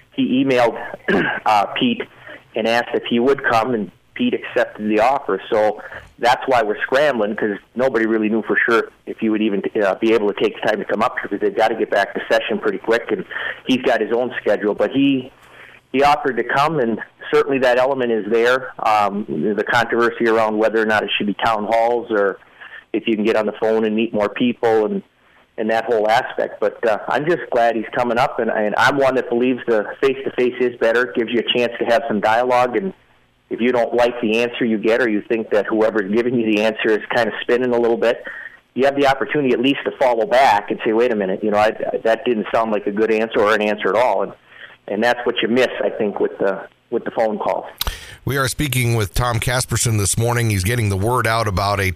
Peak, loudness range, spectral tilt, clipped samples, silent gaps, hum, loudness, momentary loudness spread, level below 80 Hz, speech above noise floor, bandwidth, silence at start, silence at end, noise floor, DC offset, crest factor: 0 dBFS; 2 LU; -5 dB/octave; under 0.1%; none; none; -18 LUFS; 7 LU; -44 dBFS; 26 dB; 15.5 kHz; 0.15 s; 0 s; -44 dBFS; under 0.1%; 18 dB